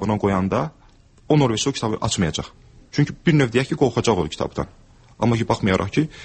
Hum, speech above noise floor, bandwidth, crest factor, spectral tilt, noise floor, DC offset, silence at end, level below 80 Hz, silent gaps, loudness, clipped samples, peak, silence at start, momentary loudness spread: none; 31 dB; 8.8 kHz; 16 dB; -5.5 dB/octave; -51 dBFS; under 0.1%; 0 s; -44 dBFS; none; -21 LUFS; under 0.1%; -4 dBFS; 0 s; 9 LU